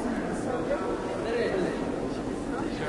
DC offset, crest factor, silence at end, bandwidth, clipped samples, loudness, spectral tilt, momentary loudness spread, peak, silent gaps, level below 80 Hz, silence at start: under 0.1%; 14 dB; 0 s; 11.5 kHz; under 0.1%; -30 LUFS; -6 dB/octave; 4 LU; -16 dBFS; none; -48 dBFS; 0 s